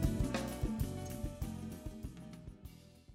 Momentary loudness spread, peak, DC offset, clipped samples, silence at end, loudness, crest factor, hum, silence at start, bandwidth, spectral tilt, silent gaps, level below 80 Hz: 16 LU; -22 dBFS; under 0.1%; under 0.1%; 0 s; -42 LUFS; 18 dB; none; 0 s; 16 kHz; -6 dB/octave; none; -46 dBFS